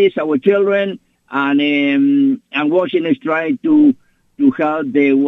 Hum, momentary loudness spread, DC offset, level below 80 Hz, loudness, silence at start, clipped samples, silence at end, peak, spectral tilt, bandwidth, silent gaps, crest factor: none; 6 LU; under 0.1%; -62 dBFS; -15 LUFS; 0 s; under 0.1%; 0 s; -2 dBFS; -8 dB/octave; 4 kHz; none; 14 dB